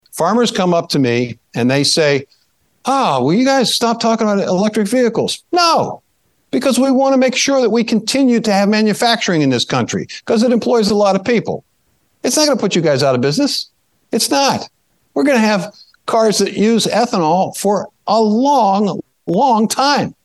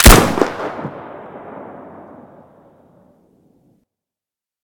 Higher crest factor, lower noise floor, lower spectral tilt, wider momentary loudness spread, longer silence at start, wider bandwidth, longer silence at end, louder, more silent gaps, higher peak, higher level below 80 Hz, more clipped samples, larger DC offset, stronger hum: about the same, 14 dB vs 18 dB; second, -62 dBFS vs -89 dBFS; about the same, -4.5 dB/octave vs -4 dB/octave; second, 8 LU vs 27 LU; first, 0.15 s vs 0 s; second, 12.5 kHz vs over 20 kHz; second, 0.15 s vs 3 s; about the same, -14 LUFS vs -15 LUFS; neither; about the same, 0 dBFS vs 0 dBFS; second, -60 dBFS vs -22 dBFS; second, under 0.1% vs 1%; neither; neither